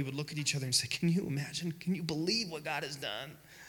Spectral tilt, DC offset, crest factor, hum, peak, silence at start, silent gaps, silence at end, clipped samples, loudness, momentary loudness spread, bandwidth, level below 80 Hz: -4 dB/octave; under 0.1%; 20 dB; none; -14 dBFS; 0 s; none; 0 s; under 0.1%; -34 LUFS; 8 LU; 19 kHz; -68 dBFS